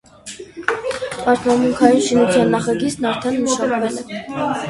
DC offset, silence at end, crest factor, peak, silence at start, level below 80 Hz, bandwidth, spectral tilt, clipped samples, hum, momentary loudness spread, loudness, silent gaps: under 0.1%; 0 s; 18 dB; 0 dBFS; 0.25 s; -52 dBFS; 11.5 kHz; -4.5 dB/octave; under 0.1%; none; 13 LU; -18 LUFS; none